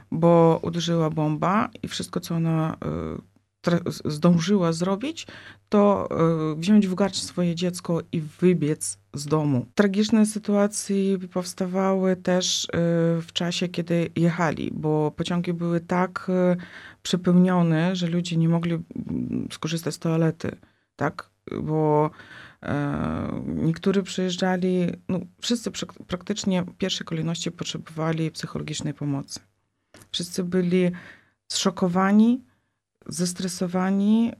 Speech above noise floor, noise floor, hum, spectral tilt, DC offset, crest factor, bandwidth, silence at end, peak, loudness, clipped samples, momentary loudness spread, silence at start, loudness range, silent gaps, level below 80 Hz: 48 dB; -71 dBFS; none; -6 dB/octave; under 0.1%; 20 dB; 13 kHz; 0.05 s; -4 dBFS; -24 LUFS; under 0.1%; 11 LU; 0.1 s; 5 LU; none; -56 dBFS